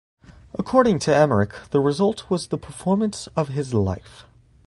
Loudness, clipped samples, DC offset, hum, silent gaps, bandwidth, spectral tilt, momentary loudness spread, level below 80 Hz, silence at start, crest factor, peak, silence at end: -22 LUFS; under 0.1%; under 0.1%; none; none; 11.5 kHz; -6.5 dB/octave; 10 LU; -46 dBFS; 0.3 s; 20 dB; -2 dBFS; 0.45 s